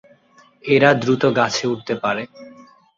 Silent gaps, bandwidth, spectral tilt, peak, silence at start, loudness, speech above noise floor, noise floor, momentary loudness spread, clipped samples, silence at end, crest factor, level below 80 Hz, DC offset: none; 7.6 kHz; -5 dB/octave; -2 dBFS; 0.65 s; -18 LUFS; 35 dB; -53 dBFS; 13 LU; under 0.1%; 0.5 s; 18 dB; -60 dBFS; under 0.1%